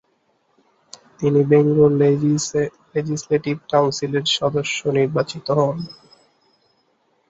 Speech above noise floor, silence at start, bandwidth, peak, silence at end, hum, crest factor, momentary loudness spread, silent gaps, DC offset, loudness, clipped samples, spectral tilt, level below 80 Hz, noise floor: 46 dB; 1.2 s; 8 kHz; -2 dBFS; 1.35 s; none; 18 dB; 9 LU; none; under 0.1%; -19 LUFS; under 0.1%; -5.5 dB/octave; -58 dBFS; -65 dBFS